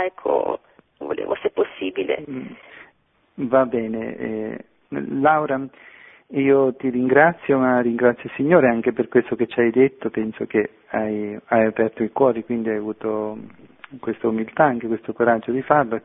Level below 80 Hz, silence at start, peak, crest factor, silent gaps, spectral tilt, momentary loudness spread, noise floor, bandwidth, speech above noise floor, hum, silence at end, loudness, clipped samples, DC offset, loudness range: -60 dBFS; 0 s; 0 dBFS; 20 dB; none; -11 dB/octave; 13 LU; -58 dBFS; 3.9 kHz; 38 dB; none; 0.05 s; -21 LUFS; under 0.1%; under 0.1%; 7 LU